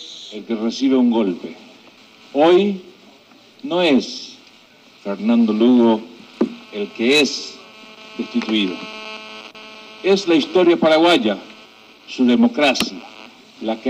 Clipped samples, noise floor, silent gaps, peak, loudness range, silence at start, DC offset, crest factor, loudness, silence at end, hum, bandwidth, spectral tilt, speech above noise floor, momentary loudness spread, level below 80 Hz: under 0.1%; -48 dBFS; none; -2 dBFS; 5 LU; 0 s; under 0.1%; 16 dB; -17 LUFS; 0 s; none; 15 kHz; -4.5 dB/octave; 32 dB; 21 LU; -64 dBFS